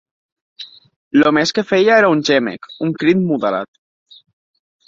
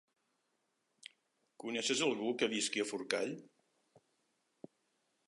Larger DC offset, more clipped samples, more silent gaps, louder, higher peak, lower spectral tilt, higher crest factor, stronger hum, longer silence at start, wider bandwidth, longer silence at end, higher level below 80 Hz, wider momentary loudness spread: neither; neither; first, 0.96-1.11 s vs none; first, -15 LUFS vs -36 LUFS; first, -2 dBFS vs -14 dBFS; first, -5.5 dB/octave vs -2.5 dB/octave; second, 16 dB vs 28 dB; neither; second, 0.6 s vs 1.6 s; second, 7.8 kHz vs 11.5 kHz; second, 1.2 s vs 1.8 s; first, -60 dBFS vs under -90 dBFS; about the same, 23 LU vs 23 LU